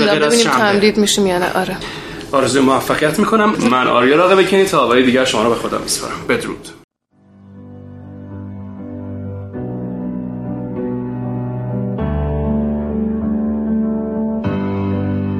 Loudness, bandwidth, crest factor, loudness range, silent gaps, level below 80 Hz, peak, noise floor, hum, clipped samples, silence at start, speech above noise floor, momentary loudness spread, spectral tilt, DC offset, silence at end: -16 LUFS; 15.5 kHz; 16 dB; 14 LU; 6.84-6.88 s; -36 dBFS; 0 dBFS; -50 dBFS; none; under 0.1%; 0 s; 36 dB; 17 LU; -4.5 dB/octave; under 0.1%; 0 s